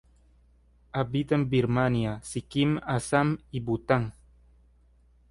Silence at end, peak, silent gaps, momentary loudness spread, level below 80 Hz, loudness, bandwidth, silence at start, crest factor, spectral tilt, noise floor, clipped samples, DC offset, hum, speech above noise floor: 1.2 s; -10 dBFS; none; 8 LU; -52 dBFS; -28 LUFS; 11.5 kHz; 0.95 s; 20 dB; -6.5 dB/octave; -61 dBFS; under 0.1%; under 0.1%; 60 Hz at -50 dBFS; 34 dB